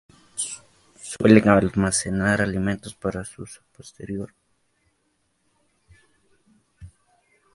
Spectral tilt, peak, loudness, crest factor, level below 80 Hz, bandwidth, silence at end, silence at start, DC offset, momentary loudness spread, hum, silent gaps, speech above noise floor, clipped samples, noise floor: -5.5 dB/octave; 0 dBFS; -22 LUFS; 24 dB; -48 dBFS; 11.5 kHz; 0.65 s; 0.35 s; under 0.1%; 25 LU; none; none; 49 dB; under 0.1%; -70 dBFS